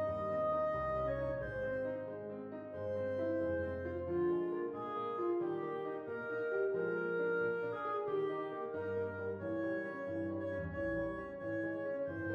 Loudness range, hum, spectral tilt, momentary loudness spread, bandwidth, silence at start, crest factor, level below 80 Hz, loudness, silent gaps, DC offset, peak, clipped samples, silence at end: 2 LU; none; -9 dB/octave; 6 LU; 6.4 kHz; 0 s; 12 dB; -60 dBFS; -38 LUFS; none; under 0.1%; -26 dBFS; under 0.1%; 0 s